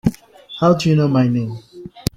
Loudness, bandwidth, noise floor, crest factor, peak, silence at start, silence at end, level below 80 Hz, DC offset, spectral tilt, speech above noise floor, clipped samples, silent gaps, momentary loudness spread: -17 LUFS; 15.5 kHz; -38 dBFS; 18 dB; 0 dBFS; 0.05 s; 0.15 s; -44 dBFS; under 0.1%; -7 dB/octave; 23 dB; under 0.1%; none; 20 LU